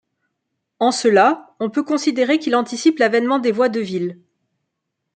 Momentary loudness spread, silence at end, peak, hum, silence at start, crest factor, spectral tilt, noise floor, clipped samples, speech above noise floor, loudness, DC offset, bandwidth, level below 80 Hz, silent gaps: 9 LU; 1 s; -2 dBFS; none; 0.8 s; 16 dB; -4.5 dB/octave; -77 dBFS; under 0.1%; 60 dB; -18 LUFS; under 0.1%; 9.2 kHz; -72 dBFS; none